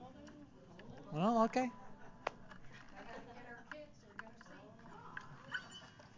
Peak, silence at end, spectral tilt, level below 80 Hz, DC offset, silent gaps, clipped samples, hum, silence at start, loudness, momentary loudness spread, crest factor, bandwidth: -18 dBFS; 0 s; -6 dB/octave; -70 dBFS; under 0.1%; none; under 0.1%; none; 0 s; -41 LUFS; 22 LU; 26 dB; 7.6 kHz